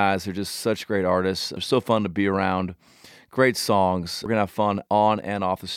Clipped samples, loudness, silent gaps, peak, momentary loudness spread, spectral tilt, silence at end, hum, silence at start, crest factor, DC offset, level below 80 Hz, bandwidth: under 0.1%; -23 LUFS; none; -4 dBFS; 7 LU; -5 dB/octave; 0 s; none; 0 s; 18 dB; under 0.1%; -58 dBFS; 16.5 kHz